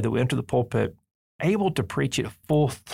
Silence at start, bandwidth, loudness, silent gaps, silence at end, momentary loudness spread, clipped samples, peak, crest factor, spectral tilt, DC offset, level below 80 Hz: 0 s; 16 kHz; -25 LUFS; 1.11-1.39 s; 0 s; 5 LU; under 0.1%; -10 dBFS; 14 dB; -6 dB/octave; under 0.1%; -54 dBFS